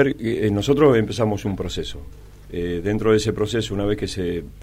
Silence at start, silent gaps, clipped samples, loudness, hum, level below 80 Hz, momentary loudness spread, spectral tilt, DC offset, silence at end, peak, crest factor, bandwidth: 0 s; none; under 0.1%; -21 LUFS; none; -40 dBFS; 12 LU; -6 dB/octave; under 0.1%; 0 s; -4 dBFS; 16 dB; 15.5 kHz